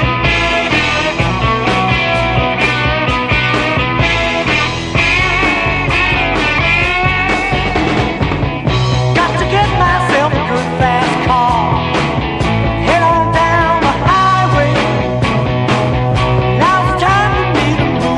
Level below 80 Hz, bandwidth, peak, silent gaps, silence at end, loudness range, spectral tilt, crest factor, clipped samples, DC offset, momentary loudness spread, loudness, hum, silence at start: -26 dBFS; 10.5 kHz; 0 dBFS; none; 0 s; 1 LU; -5.5 dB/octave; 12 dB; under 0.1%; under 0.1%; 4 LU; -12 LUFS; none; 0 s